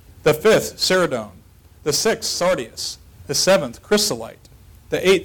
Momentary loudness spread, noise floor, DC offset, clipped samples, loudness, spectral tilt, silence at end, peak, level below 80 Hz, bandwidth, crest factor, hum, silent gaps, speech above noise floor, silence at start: 12 LU; -45 dBFS; under 0.1%; under 0.1%; -19 LUFS; -3 dB/octave; 0 s; -8 dBFS; -48 dBFS; 19 kHz; 12 dB; none; none; 27 dB; 0.25 s